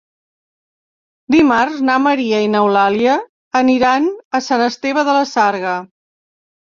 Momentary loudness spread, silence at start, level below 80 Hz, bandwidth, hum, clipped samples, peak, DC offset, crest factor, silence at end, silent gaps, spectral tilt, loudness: 7 LU; 1.3 s; -56 dBFS; 7.4 kHz; none; under 0.1%; -2 dBFS; under 0.1%; 14 dB; 0.85 s; 3.29-3.51 s, 4.25-4.31 s; -4.5 dB/octave; -15 LUFS